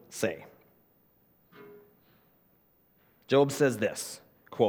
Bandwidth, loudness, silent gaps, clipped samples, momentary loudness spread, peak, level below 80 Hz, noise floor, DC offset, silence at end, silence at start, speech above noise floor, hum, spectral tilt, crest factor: over 20 kHz; -29 LUFS; none; under 0.1%; 27 LU; -10 dBFS; -76 dBFS; -67 dBFS; under 0.1%; 0 s; 0.1 s; 39 dB; none; -5 dB/octave; 22 dB